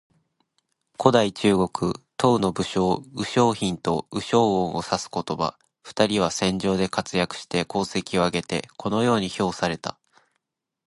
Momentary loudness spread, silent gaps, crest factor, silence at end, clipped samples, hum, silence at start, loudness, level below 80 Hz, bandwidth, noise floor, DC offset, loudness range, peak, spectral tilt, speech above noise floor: 7 LU; none; 22 dB; 1 s; under 0.1%; none; 1 s; -24 LUFS; -52 dBFS; 11.5 kHz; -79 dBFS; under 0.1%; 3 LU; -2 dBFS; -5 dB/octave; 56 dB